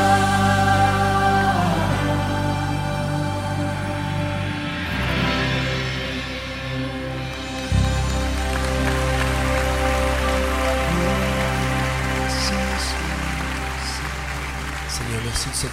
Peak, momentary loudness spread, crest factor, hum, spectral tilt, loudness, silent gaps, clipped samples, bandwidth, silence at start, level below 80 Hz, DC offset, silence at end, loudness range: -6 dBFS; 9 LU; 16 dB; none; -5 dB/octave; -22 LUFS; none; under 0.1%; 16 kHz; 0 s; -28 dBFS; under 0.1%; 0 s; 4 LU